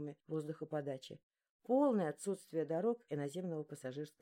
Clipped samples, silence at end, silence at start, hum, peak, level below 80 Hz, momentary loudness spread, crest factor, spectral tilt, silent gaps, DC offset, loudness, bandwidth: under 0.1%; 0.1 s; 0 s; none; -24 dBFS; under -90 dBFS; 13 LU; 16 dB; -7 dB/octave; 1.23-1.30 s, 1.49-1.60 s; under 0.1%; -40 LUFS; 16.5 kHz